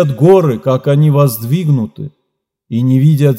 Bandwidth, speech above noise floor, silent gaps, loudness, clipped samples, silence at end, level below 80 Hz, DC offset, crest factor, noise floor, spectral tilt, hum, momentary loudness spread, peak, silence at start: 16.5 kHz; 60 dB; none; -12 LUFS; 0.1%; 0 s; -58 dBFS; under 0.1%; 12 dB; -71 dBFS; -8.5 dB/octave; none; 13 LU; 0 dBFS; 0 s